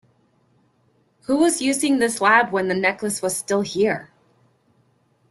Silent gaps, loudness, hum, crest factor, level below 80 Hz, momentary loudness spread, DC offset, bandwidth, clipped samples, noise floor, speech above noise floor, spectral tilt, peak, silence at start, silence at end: none; -20 LUFS; none; 20 dB; -64 dBFS; 8 LU; under 0.1%; 12.5 kHz; under 0.1%; -63 dBFS; 43 dB; -3.5 dB/octave; -2 dBFS; 1.3 s; 1.25 s